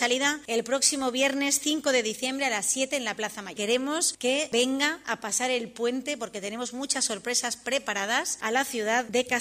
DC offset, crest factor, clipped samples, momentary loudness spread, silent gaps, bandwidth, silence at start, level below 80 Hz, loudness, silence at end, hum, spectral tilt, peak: under 0.1%; 20 dB; under 0.1%; 8 LU; none; 15.5 kHz; 0 s; -70 dBFS; -26 LUFS; 0 s; none; -1 dB/octave; -8 dBFS